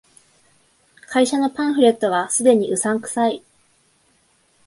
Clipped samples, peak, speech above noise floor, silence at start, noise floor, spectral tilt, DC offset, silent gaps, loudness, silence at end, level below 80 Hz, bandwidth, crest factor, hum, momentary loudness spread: under 0.1%; -2 dBFS; 43 dB; 1.1 s; -60 dBFS; -3.5 dB/octave; under 0.1%; none; -18 LUFS; 1.3 s; -68 dBFS; 11.5 kHz; 18 dB; none; 6 LU